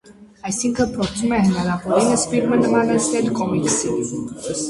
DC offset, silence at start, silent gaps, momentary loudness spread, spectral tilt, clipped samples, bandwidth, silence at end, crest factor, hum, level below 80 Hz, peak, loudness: under 0.1%; 0.1 s; none; 9 LU; -4.5 dB/octave; under 0.1%; 11.5 kHz; 0 s; 16 dB; none; -46 dBFS; -2 dBFS; -19 LUFS